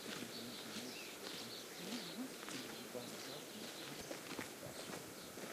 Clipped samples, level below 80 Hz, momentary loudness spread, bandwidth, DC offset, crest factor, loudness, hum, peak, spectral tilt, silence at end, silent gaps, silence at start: under 0.1%; -80 dBFS; 2 LU; 15.5 kHz; under 0.1%; 20 dB; -48 LUFS; none; -30 dBFS; -2.5 dB/octave; 0 s; none; 0 s